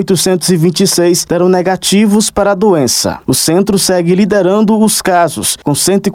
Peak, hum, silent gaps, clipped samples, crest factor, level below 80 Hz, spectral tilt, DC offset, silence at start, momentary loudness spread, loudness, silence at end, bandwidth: 0 dBFS; none; none; under 0.1%; 10 dB; -42 dBFS; -4 dB/octave; under 0.1%; 0 s; 3 LU; -10 LUFS; 0 s; 16.5 kHz